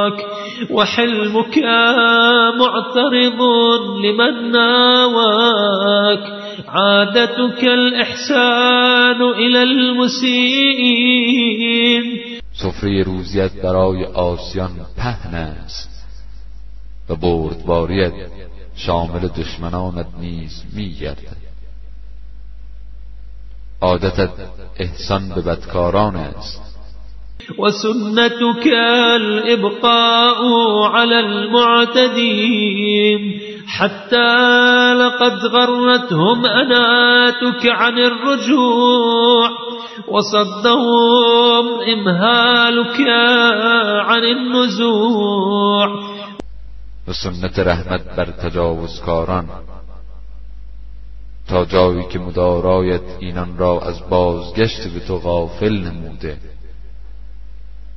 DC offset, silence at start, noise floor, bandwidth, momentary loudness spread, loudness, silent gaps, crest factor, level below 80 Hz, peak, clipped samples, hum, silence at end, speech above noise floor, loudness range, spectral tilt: under 0.1%; 0 s; -35 dBFS; 6.2 kHz; 16 LU; -14 LUFS; none; 16 dB; -36 dBFS; 0 dBFS; under 0.1%; none; 1.45 s; 20 dB; 12 LU; -5 dB/octave